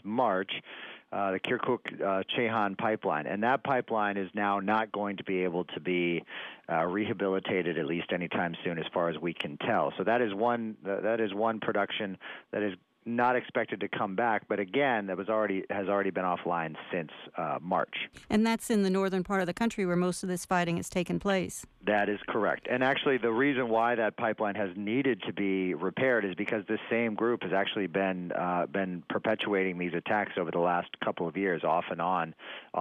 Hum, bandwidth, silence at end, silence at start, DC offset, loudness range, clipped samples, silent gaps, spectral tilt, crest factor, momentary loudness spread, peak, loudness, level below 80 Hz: none; 14.5 kHz; 0 s; 0.05 s; under 0.1%; 3 LU; under 0.1%; none; -5.5 dB/octave; 14 dB; 7 LU; -16 dBFS; -30 LUFS; -66 dBFS